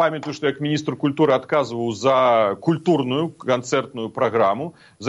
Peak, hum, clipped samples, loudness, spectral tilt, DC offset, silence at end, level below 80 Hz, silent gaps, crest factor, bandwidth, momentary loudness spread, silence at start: -4 dBFS; none; under 0.1%; -21 LUFS; -6 dB/octave; under 0.1%; 0 s; -66 dBFS; none; 16 dB; 10.5 kHz; 7 LU; 0 s